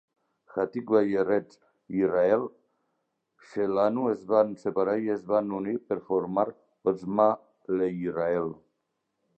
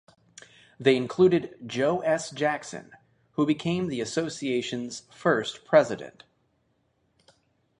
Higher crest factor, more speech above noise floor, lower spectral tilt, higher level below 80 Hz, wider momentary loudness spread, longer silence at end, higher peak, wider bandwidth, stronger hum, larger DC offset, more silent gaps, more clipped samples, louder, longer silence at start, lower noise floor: about the same, 20 dB vs 22 dB; first, 53 dB vs 45 dB; first, -8.5 dB/octave vs -5.5 dB/octave; about the same, -68 dBFS vs -66 dBFS; second, 8 LU vs 14 LU; second, 0.85 s vs 1.7 s; about the same, -8 dBFS vs -6 dBFS; second, 8 kHz vs 10.5 kHz; neither; neither; neither; neither; about the same, -27 LUFS vs -26 LUFS; second, 0.55 s vs 0.8 s; first, -80 dBFS vs -71 dBFS